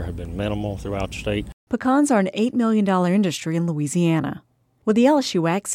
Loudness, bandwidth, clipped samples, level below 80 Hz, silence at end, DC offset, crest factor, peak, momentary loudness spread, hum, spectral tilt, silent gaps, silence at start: -21 LUFS; 16 kHz; under 0.1%; -42 dBFS; 0 s; under 0.1%; 16 dB; -6 dBFS; 10 LU; none; -6 dB/octave; 1.53-1.67 s; 0 s